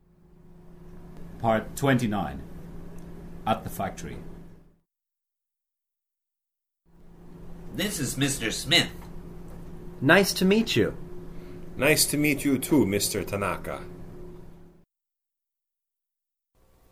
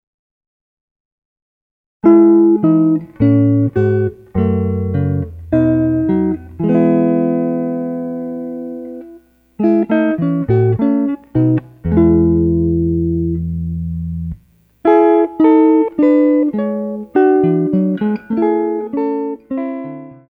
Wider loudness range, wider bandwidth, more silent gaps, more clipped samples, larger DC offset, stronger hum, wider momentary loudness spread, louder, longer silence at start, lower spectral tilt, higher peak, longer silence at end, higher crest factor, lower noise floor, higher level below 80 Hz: first, 13 LU vs 5 LU; first, 16.5 kHz vs 3.7 kHz; neither; neither; neither; neither; first, 23 LU vs 12 LU; second, -25 LUFS vs -15 LUFS; second, 0.45 s vs 2.05 s; second, -4 dB/octave vs -11.5 dB/octave; second, -4 dBFS vs 0 dBFS; first, 2.25 s vs 0.15 s; first, 24 dB vs 14 dB; first, -87 dBFS vs -47 dBFS; second, -46 dBFS vs -36 dBFS